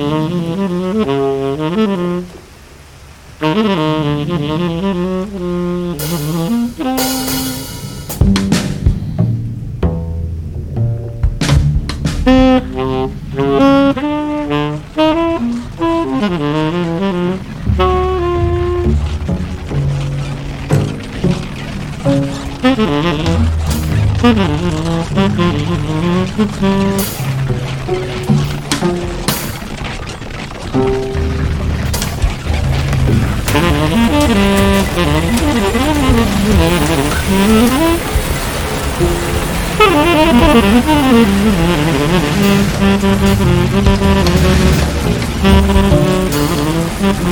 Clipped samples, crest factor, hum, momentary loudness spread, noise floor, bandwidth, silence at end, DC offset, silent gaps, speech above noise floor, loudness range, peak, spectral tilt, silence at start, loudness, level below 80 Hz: under 0.1%; 14 dB; none; 9 LU; -37 dBFS; over 20 kHz; 0 s; under 0.1%; none; 21 dB; 6 LU; 0 dBFS; -6 dB/octave; 0 s; -14 LUFS; -22 dBFS